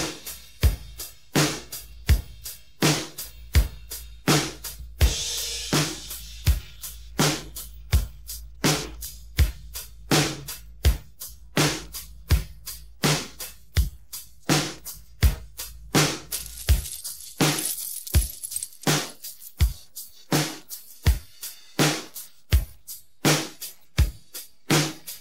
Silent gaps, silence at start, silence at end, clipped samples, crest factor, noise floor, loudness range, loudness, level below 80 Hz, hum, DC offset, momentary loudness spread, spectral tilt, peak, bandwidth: none; 0 s; 0 s; under 0.1%; 20 dB; -44 dBFS; 2 LU; -26 LUFS; -30 dBFS; none; 0.4%; 15 LU; -4 dB/octave; -6 dBFS; 16.5 kHz